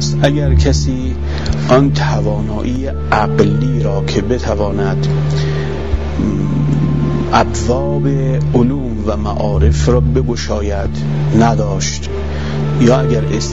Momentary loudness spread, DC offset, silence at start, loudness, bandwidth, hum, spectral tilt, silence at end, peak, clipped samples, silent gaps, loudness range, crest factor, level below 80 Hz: 7 LU; 5%; 0 s; -15 LUFS; 8 kHz; none; -6.5 dB/octave; 0 s; 0 dBFS; 0.1%; none; 1 LU; 14 dB; -22 dBFS